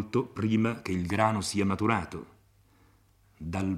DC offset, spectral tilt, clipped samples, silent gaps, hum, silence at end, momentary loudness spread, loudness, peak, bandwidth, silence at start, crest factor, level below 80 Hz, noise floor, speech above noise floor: under 0.1%; -6 dB/octave; under 0.1%; none; none; 0 s; 13 LU; -29 LUFS; -8 dBFS; 14 kHz; 0 s; 22 dB; -60 dBFS; -63 dBFS; 35 dB